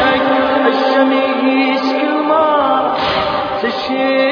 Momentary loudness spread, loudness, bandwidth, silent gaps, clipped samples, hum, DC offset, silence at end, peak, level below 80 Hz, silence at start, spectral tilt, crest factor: 5 LU; -14 LUFS; 5.4 kHz; none; under 0.1%; none; under 0.1%; 0 s; 0 dBFS; -48 dBFS; 0 s; -5.5 dB/octave; 14 dB